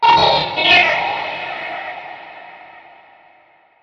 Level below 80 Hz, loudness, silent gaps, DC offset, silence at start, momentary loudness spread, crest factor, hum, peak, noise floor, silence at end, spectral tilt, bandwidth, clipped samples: -50 dBFS; -15 LUFS; none; under 0.1%; 0 s; 23 LU; 18 dB; none; 0 dBFS; -52 dBFS; 1.05 s; -3.5 dB/octave; 7.4 kHz; under 0.1%